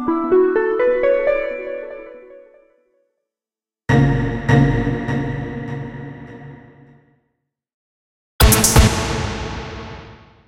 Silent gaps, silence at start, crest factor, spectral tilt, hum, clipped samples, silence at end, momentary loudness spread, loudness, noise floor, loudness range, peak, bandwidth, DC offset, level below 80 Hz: 7.74-8.39 s; 0 s; 20 dB; -5 dB/octave; none; under 0.1%; 0.35 s; 21 LU; -17 LUFS; under -90 dBFS; 7 LU; 0 dBFS; 16 kHz; under 0.1%; -28 dBFS